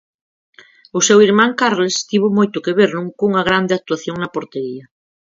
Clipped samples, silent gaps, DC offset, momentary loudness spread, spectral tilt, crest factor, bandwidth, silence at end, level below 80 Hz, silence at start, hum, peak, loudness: under 0.1%; none; under 0.1%; 14 LU; -4 dB/octave; 16 dB; 7.8 kHz; 0.4 s; -56 dBFS; 0.95 s; none; 0 dBFS; -16 LUFS